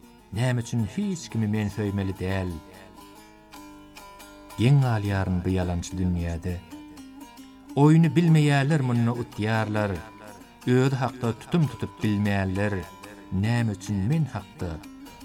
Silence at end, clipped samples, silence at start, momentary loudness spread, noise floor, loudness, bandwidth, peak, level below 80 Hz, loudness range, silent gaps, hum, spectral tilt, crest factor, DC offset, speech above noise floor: 0 s; under 0.1%; 0.3 s; 24 LU; -49 dBFS; -25 LUFS; 15 kHz; -8 dBFS; -52 dBFS; 7 LU; none; 50 Hz at -45 dBFS; -7 dB/octave; 18 dB; under 0.1%; 25 dB